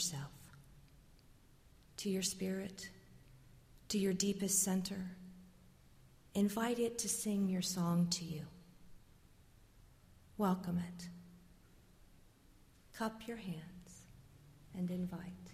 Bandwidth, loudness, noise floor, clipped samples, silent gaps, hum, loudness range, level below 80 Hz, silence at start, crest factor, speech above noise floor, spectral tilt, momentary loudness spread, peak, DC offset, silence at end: 15.5 kHz; -38 LUFS; -65 dBFS; under 0.1%; none; none; 9 LU; -66 dBFS; 0 s; 22 dB; 27 dB; -4.5 dB/octave; 21 LU; -20 dBFS; under 0.1%; 0 s